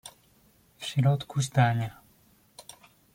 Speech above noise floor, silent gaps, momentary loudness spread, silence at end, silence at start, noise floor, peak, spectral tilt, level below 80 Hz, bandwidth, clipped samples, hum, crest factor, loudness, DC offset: 37 dB; none; 24 LU; 0.55 s; 0.05 s; -62 dBFS; -10 dBFS; -6 dB/octave; -64 dBFS; 16 kHz; under 0.1%; none; 20 dB; -27 LUFS; under 0.1%